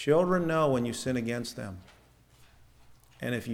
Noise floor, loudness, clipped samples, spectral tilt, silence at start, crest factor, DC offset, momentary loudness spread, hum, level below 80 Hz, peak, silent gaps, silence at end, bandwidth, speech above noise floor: -60 dBFS; -29 LUFS; under 0.1%; -6 dB/octave; 0 s; 18 dB; under 0.1%; 16 LU; none; -60 dBFS; -12 dBFS; none; 0 s; 18 kHz; 31 dB